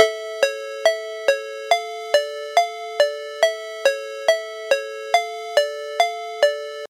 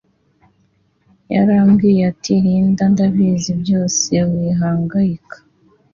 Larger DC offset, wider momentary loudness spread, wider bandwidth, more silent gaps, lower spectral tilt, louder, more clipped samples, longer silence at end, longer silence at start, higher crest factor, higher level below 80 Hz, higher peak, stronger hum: neither; second, 2 LU vs 7 LU; first, 16.5 kHz vs 7.4 kHz; neither; second, 1.5 dB/octave vs -6 dB/octave; second, -22 LUFS vs -15 LUFS; neither; second, 0.05 s vs 0.6 s; second, 0 s vs 1.3 s; first, 22 dB vs 12 dB; second, -78 dBFS vs -48 dBFS; first, 0 dBFS vs -4 dBFS; neither